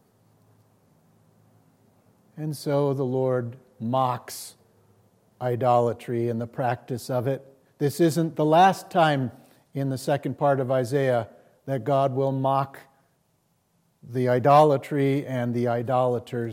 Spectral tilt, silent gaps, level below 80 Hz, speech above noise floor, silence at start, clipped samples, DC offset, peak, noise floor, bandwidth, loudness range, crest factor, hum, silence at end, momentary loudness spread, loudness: -7 dB/octave; none; -74 dBFS; 45 dB; 2.35 s; under 0.1%; under 0.1%; -6 dBFS; -69 dBFS; 16.5 kHz; 5 LU; 18 dB; none; 0 s; 15 LU; -24 LUFS